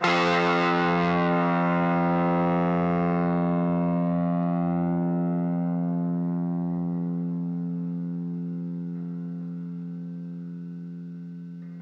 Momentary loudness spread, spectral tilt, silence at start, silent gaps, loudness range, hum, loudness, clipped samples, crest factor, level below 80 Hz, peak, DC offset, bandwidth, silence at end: 14 LU; -8 dB/octave; 0 s; none; 11 LU; none; -26 LUFS; under 0.1%; 16 dB; -62 dBFS; -8 dBFS; under 0.1%; 7 kHz; 0 s